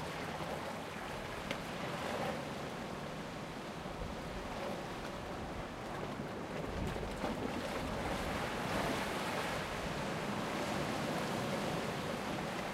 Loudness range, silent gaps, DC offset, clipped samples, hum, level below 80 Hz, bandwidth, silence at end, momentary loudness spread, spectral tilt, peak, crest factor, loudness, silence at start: 5 LU; none; under 0.1%; under 0.1%; none; -54 dBFS; 16 kHz; 0 s; 6 LU; -4.5 dB/octave; -20 dBFS; 20 dB; -40 LUFS; 0 s